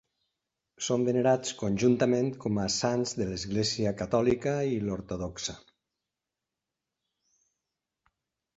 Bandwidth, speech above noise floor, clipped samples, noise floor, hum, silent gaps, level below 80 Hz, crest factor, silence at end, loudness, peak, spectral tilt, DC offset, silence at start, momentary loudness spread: 8.2 kHz; 60 dB; under 0.1%; -88 dBFS; none; none; -56 dBFS; 20 dB; 2.95 s; -29 LUFS; -12 dBFS; -5 dB/octave; under 0.1%; 0.8 s; 9 LU